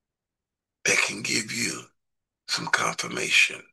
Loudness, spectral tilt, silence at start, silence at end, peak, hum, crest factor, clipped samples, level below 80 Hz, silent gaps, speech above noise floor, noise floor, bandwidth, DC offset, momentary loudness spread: -24 LUFS; -1 dB/octave; 0.85 s; 0.1 s; -6 dBFS; none; 22 dB; under 0.1%; -74 dBFS; none; 62 dB; -88 dBFS; 12.5 kHz; under 0.1%; 10 LU